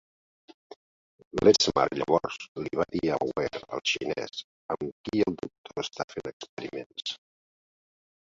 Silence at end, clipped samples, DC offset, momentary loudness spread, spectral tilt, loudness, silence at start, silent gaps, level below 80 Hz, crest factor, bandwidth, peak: 1.15 s; under 0.1%; under 0.1%; 16 LU; -4 dB/octave; -29 LUFS; 1.35 s; 2.48-2.55 s, 4.44-4.69 s, 4.92-5.04 s, 5.58-5.64 s, 6.04-6.08 s, 6.33-6.40 s, 6.49-6.57 s, 6.86-6.90 s; -60 dBFS; 24 dB; 7.8 kHz; -6 dBFS